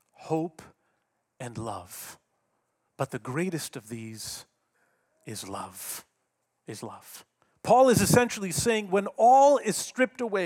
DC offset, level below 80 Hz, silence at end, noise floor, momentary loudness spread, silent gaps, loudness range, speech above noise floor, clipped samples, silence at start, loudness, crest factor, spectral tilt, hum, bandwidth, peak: under 0.1%; -62 dBFS; 0 s; -78 dBFS; 22 LU; none; 17 LU; 52 dB; under 0.1%; 0.2 s; -25 LUFS; 22 dB; -4.5 dB/octave; none; 18 kHz; -6 dBFS